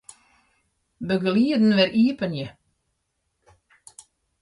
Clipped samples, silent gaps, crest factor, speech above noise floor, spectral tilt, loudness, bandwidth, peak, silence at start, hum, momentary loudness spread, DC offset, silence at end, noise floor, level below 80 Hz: under 0.1%; none; 18 dB; 55 dB; -6.5 dB/octave; -21 LUFS; 11.5 kHz; -6 dBFS; 1 s; none; 16 LU; under 0.1%; 1.9 s; -75 dBFS; -64 dBFS